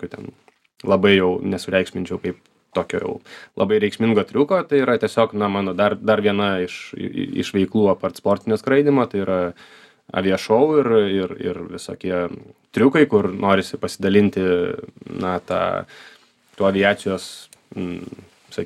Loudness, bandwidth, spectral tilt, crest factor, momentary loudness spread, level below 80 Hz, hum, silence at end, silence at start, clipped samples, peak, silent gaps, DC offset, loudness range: -20 LUFS; 12.5 kHz; -6 dB/octave; 18 dB; 15 LU; -60 dBFS; none; 0 s; 0 s; under 0.1%; -2 dBFS; none; under 0.1%; 3 LU